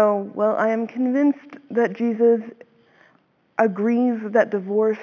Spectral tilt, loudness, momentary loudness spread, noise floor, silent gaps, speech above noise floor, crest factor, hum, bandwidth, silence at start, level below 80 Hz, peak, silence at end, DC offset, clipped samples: -8.5 dB/octave; -21 LUFS; 5 LU; -61 dBFS; none; 40 dB; 18 dB; none; 6.8 kHz; 0 s; -84 dBFS; -2 dBFS; 0 s; under 0.1%; under 0.1%